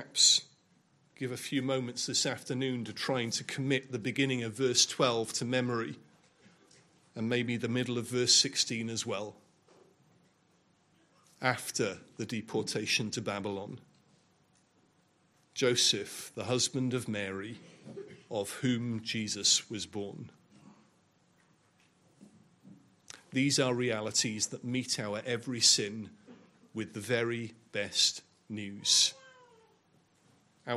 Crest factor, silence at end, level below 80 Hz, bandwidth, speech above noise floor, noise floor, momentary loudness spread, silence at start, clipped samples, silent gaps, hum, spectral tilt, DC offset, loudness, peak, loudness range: 24 dB; 0 s; -78 dBFS; 14.5 kHz; 37 dB; -69 dBFS; 19 LU; 0 s; under 0.1%; none; none; -2.5 dB/octave; under 0.1%; -31 LUFS; -10 dBFS; 6 LU